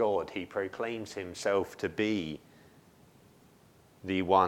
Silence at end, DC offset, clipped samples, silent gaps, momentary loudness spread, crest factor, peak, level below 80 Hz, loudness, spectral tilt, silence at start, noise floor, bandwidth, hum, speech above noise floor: 0 s; under 0.1%; under 0.1%; none; 10 LU; 22 dB; -10 dBFS; -66 dBFS; -33 LUFS; -5 dB/octave; 0 s; -61 dBFS; 17 kHz; none; 30 dB